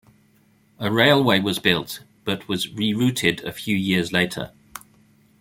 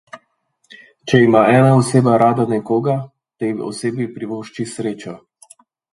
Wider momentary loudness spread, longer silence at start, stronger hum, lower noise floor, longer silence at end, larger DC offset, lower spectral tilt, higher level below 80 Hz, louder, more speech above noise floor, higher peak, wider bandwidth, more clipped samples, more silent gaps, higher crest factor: about the same, 17 LU vs 16 LU; first, 0.8 s vs 0.15 s; neither; second, -59 dBFS vs -65 dBFS; about the same, 0.65 s vs 0.75 s; neither; second, -4.5 dB/octave vs -7 dB/octave; about the same, -58 dBFS vs -56 dBFS; second, -21 LUFS vs -16 LUFS; second, 38 dB vs 50 dB; about the same, -2 dBFS vs 0 dBFS; first, 16.5 kHz vs 11.5 kHz; neither; neither; about the same, 20 dB vs 18 dB